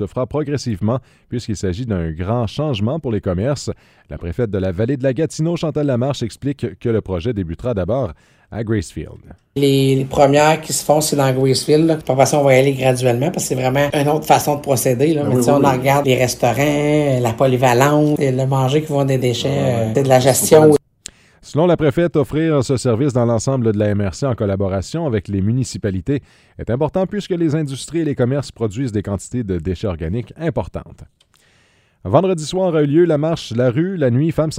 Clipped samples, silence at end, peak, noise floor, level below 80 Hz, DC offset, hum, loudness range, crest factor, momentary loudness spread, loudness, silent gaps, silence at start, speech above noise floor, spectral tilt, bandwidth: under 0.1%; 0 s; 0 dBFS; -56 dBFS; -42 dBFS; under 0.1%; none; 7 LU; 16 dB; 10 LU; -17 LUFS; none; 0 s; 39 dB; -6 dB/octave; 16 kHz